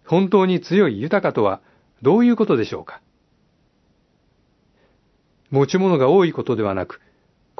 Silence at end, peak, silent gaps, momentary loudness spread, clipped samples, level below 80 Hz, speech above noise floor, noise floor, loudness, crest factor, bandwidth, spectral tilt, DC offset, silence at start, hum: 0.65 s; -4 dBFS; none; 12 LU; under 0.1%; -64 dBFS; 44 dB; -62 dBFS; -18 LUFS; 18 dB; 6.2 kHz; -7.5 dB/octave; under 0.1%; 0.1 s; none